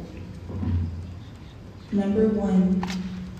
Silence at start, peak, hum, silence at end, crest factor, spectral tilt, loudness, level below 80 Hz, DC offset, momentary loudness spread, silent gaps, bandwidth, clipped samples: 0 s; -10 dBFS; none; 0 s; 16 dB; -8.5 dB/octave; -25 LUFS; -38 dBFS; under 0.1%; 21 LU; none; 8.4 kHz; under 0.1%